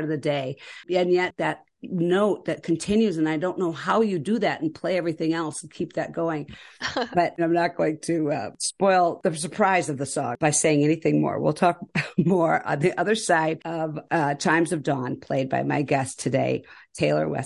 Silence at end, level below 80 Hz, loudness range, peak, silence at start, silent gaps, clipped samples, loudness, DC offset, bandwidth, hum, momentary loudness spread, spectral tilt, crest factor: 0 s; -60 dBFS; 4 LU; -6 dBFS; 0 s; none; under 0.1%; -24 LUFS; under 0.1%; 11.5 kHz; none; 8 LU; -5 dB/octave; 18 dB